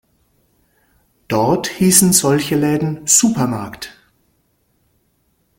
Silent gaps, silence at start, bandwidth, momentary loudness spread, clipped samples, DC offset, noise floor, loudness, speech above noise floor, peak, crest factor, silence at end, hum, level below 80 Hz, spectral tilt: none; 1.3 s; 17 kHz; 16 LU; under 0.1%; under 0.1%; -63 dBFS; -14 LUFS; 48 dB; 0 dBFS; 18 dB; 1.7 s; none; -52 dBFS; -4 dB/octave